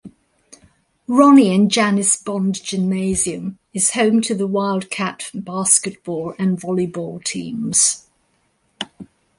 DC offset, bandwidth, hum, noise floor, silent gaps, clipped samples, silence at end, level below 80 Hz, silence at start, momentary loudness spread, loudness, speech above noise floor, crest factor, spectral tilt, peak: under 0.1%; 11.5 kHz; none; -64 dBFS; none; under 0.1%; 0.35 s; -54 dBFS; 0.05 s; 15 LU; -17 LUFS; 47 dB; 18 dB; -4 dB/octave; 0 dBFS